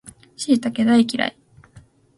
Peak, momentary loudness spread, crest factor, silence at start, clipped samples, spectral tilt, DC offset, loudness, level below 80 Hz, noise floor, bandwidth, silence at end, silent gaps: -4 dBFS; 9 LU; 16 dB; 0.05 s; under 0.1%; -4.5 dB/octave; under 0.1%; -20 LUFS; -60 dBFS; -50 dBFS; 11.5 kHz; 0.4 s; none